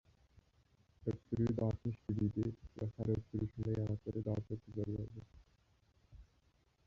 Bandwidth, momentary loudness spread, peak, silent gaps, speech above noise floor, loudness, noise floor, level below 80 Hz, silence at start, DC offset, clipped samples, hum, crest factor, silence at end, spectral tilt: 7 kHz; 8 LU; -24 dBFS; none; 35 dB; -41 LUFS; -74 dBFS; -58 dBFS; 1 s; under 0.1%; under 0.1%; none; 18 dB; 0.65 s; -10.5 dB/octave